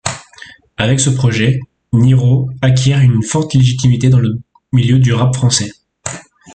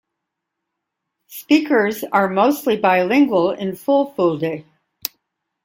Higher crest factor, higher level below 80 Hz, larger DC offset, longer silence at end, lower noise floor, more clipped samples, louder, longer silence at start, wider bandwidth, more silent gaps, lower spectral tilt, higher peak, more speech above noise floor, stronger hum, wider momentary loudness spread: second, 12 dB vs 20 dB; first, -42 dBFS vs -64 dBFS; neither; second, 0.35 s vs 1.05 s; second, -38 dBFS vs -79 dBFS; neither; first, -12 LUFS vs -17 LUFS; second, 0.05 s vs 1.3 s; second, 9.2 kHz vs 17 kHz; neither; about the same, -5.5 dB/octave vs -5.5 dB/octave; about the same, 0 dBFS vs 0 dBFS; second, 28 dB vs 62 dB; neither; about the same, 15 LU vs 14 LU